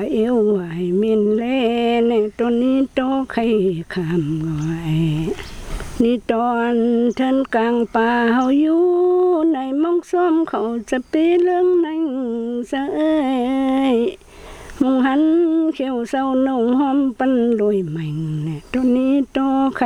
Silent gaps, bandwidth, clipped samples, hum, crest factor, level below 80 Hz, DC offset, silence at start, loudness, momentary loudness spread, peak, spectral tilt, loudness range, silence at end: none; 11.5 kHz; under 0.1%; none; 14 dB; -44 dBFS; under 0.1%; 0 s; -18 LUFS; 8 LU; -4 dBFS; -7.5 dB/octave; 3 LU; 0 s